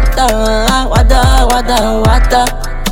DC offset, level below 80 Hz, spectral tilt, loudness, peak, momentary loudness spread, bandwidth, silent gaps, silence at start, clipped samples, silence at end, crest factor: under 0.1%; -12 dBFS; -4.5 dB/octave; -11 LUFS; 0 dBFS; 3 LU; 17 kHz; none; 0 s; under 0.1%; 0 s; 8 dB